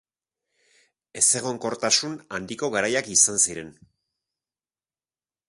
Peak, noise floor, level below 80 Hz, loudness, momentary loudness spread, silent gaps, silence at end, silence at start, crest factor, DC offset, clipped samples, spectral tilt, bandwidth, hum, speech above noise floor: -6 dBFS; under -90 dBFS; -64 dBFS; -21 LUFS; 15 LU; none; 1.8 s; 1.15 s; 22 dB; under 0.1%; under 0.1%; -1 dB/octave; 12 kHz; none; over 66 dB